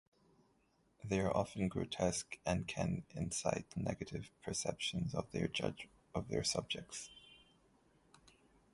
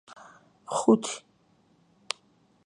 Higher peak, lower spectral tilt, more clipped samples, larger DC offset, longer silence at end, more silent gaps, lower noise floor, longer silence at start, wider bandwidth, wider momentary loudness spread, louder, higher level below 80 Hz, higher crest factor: second, -18 dBFS vs -6 dBFS; about the same, -4.5 dB/octave vs -4.5 dB/octave; neither; neither; about the same, 1.35 s vs 1.45 s; neither; first, -75 dBFS vs -65 dBFS; first, 1 s vs 0.7 s; about the same, 11.5 kHz vs 11 kHz; second, 10 LU vs 27 LU; second, -40 LUFS vs -28 LUFS; first, -60 dBFS vs -78 dBFS; about the same, 24 dB vs 24 dB